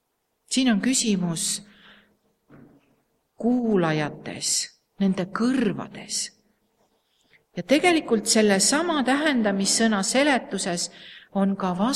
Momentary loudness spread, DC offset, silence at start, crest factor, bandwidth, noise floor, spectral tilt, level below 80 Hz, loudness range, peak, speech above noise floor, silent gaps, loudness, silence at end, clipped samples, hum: 12 LU; under 0.1%; 0.5 s; 18 dB; 14.5 kHz; -68 dBFS; -3.5 dB/octave; -62 dBFS; 6 LU; -6 dBFS; 45 dB; none; -23 LUFS; 0 s; under 0.1%; none